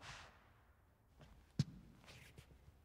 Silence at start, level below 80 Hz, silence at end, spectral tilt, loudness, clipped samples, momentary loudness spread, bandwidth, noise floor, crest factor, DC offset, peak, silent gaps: 0 s; -68 dBFS; 0 s; -5.5 dB/octave; -49 LUFS; under 0.1%; 22 LU; 15.5 kHz; -71 dBFS; 28 dB; under 0.1%; -24 dBFS; none